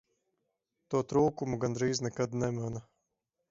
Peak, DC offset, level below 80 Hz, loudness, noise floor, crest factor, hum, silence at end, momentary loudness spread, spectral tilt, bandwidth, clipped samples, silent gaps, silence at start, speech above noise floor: -14 dBFS; under 0.1%; -62 dBFS; -32 LUFS; -84 dBFS; 20 dB; none; 0.7 s; 9 LU; -6 dB/octave; 7.8 kHz; under 0.1%; none; 0.9 s; 53 dB